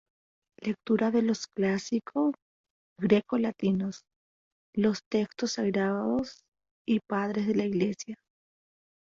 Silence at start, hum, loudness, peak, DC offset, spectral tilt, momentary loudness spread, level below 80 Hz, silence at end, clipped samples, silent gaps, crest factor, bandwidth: 0.6 s; none; -29 LUFS; -10 dBFS; under 0.1%; -6 dB/octave; 11 LU; -68 dBFS; 0.95 s; under 0.1%; 2.42-2.64 s, 2.70-2.96 s, 4.16-4.73 s, 5.06-5.11 s, 6.48-6.52 s, 6.71-6.85 s; 20 dB; 7.6 kHz